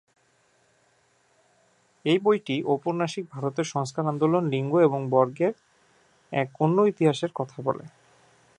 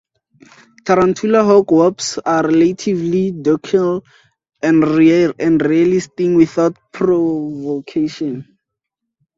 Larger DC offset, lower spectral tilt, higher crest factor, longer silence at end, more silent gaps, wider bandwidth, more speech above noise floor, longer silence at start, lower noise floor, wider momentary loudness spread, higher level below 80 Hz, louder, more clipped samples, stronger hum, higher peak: neither; about the same, -6.5 dB/octave vs -6.5 dB/octave; first, 20 dB vs 14 dB; second, 0.7 s vs 0.95 s; neither; first, 11 kHz vs 7.8 kHz; second, 41 dB vs 65 dB; first, 2.05 s vs 0.85 s; second, -65 dBFS vs -79 dBFS; about the same, 9 LU vs 10 LU; second, -74 dBFS vs -54 dBFS; second, -25 LUFS vs -15 LUFS; neither; neither; second, -8 dBFS vs 0 dBFS